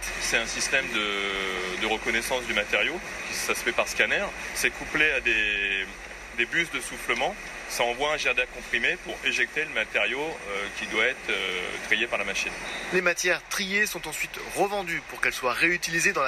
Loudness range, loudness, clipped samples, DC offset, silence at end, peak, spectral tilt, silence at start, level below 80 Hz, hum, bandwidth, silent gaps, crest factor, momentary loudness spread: 2 LU; -26 LUFS; under 0.1%; under 0.1%; 0 s; -4 dBFS; -1.5 dB/octave; 0 s; -50 dBFS; none; 14 kHz; none; 22 dB; 8 LU